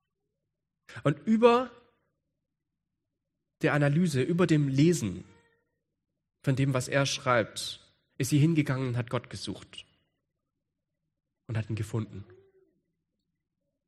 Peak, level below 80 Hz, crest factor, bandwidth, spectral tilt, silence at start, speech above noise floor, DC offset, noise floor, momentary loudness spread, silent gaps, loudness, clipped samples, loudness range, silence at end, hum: -8 dBFS; -66 dBFS; 24 dB; 13.5 kHz; -6 dB/octave; 0.9 s; 59 dB; under 0.1%; -86 dBFS; 17 LU; none; -28 LUFS; under 0.1%; 12 LU; 1.65 s; none